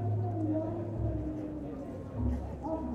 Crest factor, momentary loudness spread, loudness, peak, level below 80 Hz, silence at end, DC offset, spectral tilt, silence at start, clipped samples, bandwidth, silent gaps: 14 dB; 8 LU; -36 LUFS; -20 dBFS; -44 dBFS; 0 s; under 0.1%; -10.5 dB/octave; 0 s; under 0.1%; 3.8 kHz; none